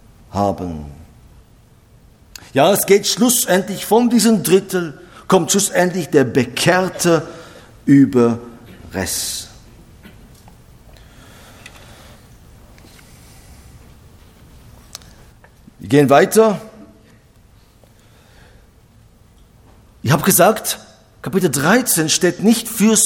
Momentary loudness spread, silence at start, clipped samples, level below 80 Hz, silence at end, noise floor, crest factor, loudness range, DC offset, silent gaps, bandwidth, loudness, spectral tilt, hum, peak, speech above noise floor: 19 LU; 0.35 s; under 0.1%; -48 dBFS; 0 s; -48 dBFS; 18 dB; 10 LU; under 0.1%; none; 19 kHz; -15 LUFS; -4 dB/octave; none; 0 dBFS; 34 dB